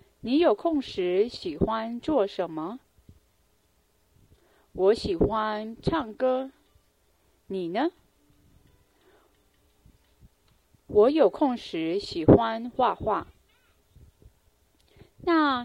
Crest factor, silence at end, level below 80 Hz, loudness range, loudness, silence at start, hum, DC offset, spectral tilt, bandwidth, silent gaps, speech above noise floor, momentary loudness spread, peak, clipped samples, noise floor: 24 dB; 0 s; -50 dBFS; 13 LU; -26 LUFS; 0.25 s; none; under 0.1%; -7.5 dB/octave; 11 kHz; none; 43 dB; 12 LU; -2 dBFS; under 0.1%; -67 dBFS